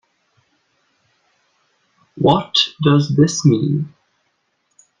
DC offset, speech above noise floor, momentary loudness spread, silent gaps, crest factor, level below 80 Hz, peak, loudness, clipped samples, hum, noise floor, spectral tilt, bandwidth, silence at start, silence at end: under 0.1%; 52 dB; 7 LU; none; 18 dB; -54 dBFS; -2 dBFS; -16 LUFS; under 0.1%; none; -67 dBFS; -5.5 dB/octave; 9.4 kHz; 2.15 s; 1.1 s